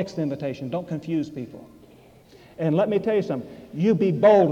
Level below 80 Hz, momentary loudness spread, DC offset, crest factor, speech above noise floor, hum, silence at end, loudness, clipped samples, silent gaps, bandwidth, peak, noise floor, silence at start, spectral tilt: -62 dBFS; 15 LU; under 0.1%; 16 dB; 29 dB; none; 0 s; -23 LUFS; under 0.1%; none; 8 kHz; -6 dBFS; -51 dBFS; 0 s; -8.5 dB/octave